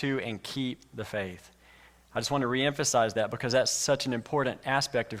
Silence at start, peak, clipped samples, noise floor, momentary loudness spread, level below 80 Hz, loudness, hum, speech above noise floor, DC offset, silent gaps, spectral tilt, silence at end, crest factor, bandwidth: 0 s; -12 dBFS; under 0.1%; -57 dBFS; 10 LU; -64 dBFS; -29 LUFS; none; 28 dB; under 0.1%; none; -3.5 dB/octave; 0 s; 18 dB; 16.5 kHz